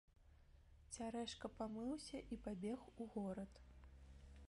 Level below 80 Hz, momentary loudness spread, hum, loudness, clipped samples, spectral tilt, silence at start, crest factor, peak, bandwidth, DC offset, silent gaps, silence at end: -66 dBFS; 16 LU; none; -50 LUFS; under 0.1%; -5 dB/octave; 0.1 s; 18 dB; -34 dBFS; 11.5 kHz; under 0.1%; none; 0 s